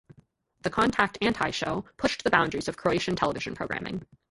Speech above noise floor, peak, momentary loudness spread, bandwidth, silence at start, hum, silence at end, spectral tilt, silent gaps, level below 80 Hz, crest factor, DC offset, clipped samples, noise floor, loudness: 34 dB; -6 dBFS; 9 LU; 11.5 kHz; 0.65 s; none; 0.25 s; -4.5 dB/octave; none; -54 dBFS; 24 dB; under 0.1%; under 0.1%; -62 dBFS; -27 LUFS